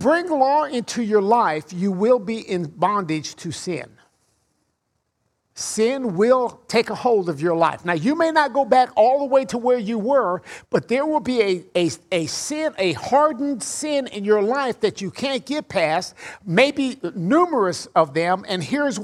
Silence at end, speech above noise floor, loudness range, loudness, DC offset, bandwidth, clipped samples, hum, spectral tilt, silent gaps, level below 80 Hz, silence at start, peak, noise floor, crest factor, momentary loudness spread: 0 s; 53 dB; 6 LU; -21 LUFS; under 0.1%; 13.5 kHz; under 0.1%; none; -4.5 dB/octave; none; -64 dBFS; 0 s; -2 dBFS; -73 dBFS; 18 dB; 8 LU